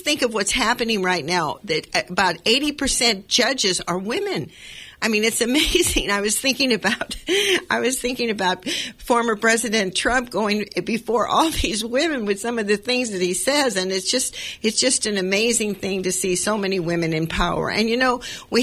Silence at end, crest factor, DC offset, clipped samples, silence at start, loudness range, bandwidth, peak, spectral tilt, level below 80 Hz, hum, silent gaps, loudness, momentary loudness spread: 0 s; 18 dB; under 0.1%; under 0.1%; 0 s; 2 LU; 16 kHz; -4 dBFS; -2.5 dB/octave; -40 dBFS; none; none; -20 LUFS; 6 LU